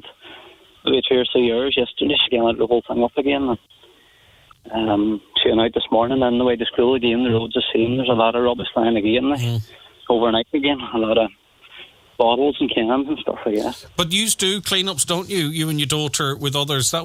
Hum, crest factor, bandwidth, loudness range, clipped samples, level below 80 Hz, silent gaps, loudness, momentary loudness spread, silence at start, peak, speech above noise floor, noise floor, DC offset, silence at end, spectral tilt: none; 18 dB; 16.5 kHz; 3 LU; under 0.1%; -50 dBFS; none; -19 LUFS; 6 LU; 0.05 s; -2 dBFS; 33 dB; -52 dBFS; under 0.1%; 0 s; -4 dB/octave